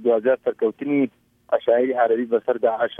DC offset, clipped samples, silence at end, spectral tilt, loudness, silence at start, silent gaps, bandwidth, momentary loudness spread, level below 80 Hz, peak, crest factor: under 0.1%; under 0.1%; 0.05 s; -8 dB/octave; -21 LUFS; 0 s; none; 3.7 kHz; 5 LU; -72 dBFS; -6 dBFS; 14 dB